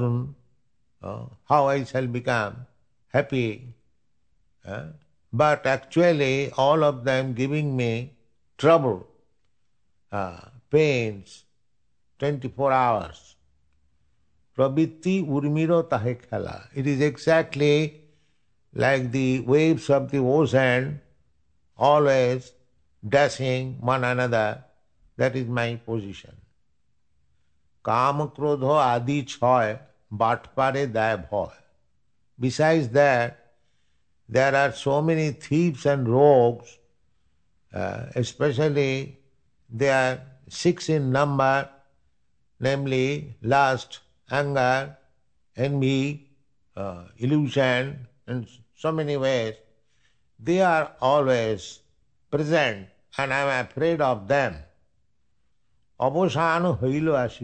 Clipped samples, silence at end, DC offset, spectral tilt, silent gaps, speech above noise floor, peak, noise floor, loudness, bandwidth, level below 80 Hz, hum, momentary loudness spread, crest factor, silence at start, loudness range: under 0.1%; 0 s; under 0.1%; -6.5 dB/octave; none; 53 dB; -4 dBFS; -76 dBFS; -23 LUFS; 9 kHz; -58 dBFS; none; 15 LU; 20 dB; 0 s; 5 LU